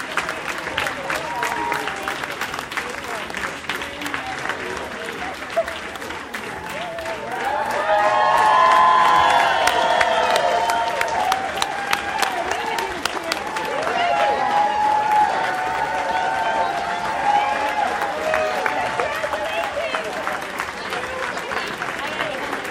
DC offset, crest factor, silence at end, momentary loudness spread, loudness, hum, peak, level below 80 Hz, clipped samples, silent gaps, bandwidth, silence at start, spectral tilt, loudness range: under 0.1%; 20 dB; 0 s; 11 LU; -21 LUFS; none; -2 dBFS; -52 dBFS; under 0.1%; none; 16.5 kHz; 0 s; -2.5 dB/octave; 10 LU